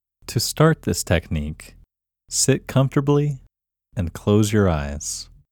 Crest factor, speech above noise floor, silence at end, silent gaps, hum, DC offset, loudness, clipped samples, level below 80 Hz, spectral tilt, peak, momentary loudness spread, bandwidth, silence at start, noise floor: 18 dB; 40 dB; 0.3 s; none; none; under 0.1%; -21 LUFS; under 0.1%; -38 dBFS; -5 dB/octave; -2 dBFS; 13 LU; 19 kHz; 0.3 s; -60 dBFS